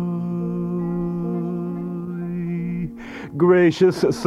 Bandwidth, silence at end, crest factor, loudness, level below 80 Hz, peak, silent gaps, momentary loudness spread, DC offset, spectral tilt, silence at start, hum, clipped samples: 11.5 kHz; 0 s; 18 dB; -22 LUFS; -50 dBFS; -4 dBFS; none; 13 LU; under 0.1%; -7.5 dB/octave; 0 s; none; under 0.1%